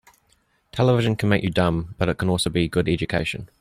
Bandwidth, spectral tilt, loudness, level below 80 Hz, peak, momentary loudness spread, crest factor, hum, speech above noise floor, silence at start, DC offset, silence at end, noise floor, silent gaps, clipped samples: 15.5 kHz; -6 dB/octave; -22 LUFS; -44 dBFS; -6 dBFS; 6 LU; 16 dB; none; 43 dB; 0.75 s; under 0.1%; 0.15 s; -64 dBFS; none; under 0.1%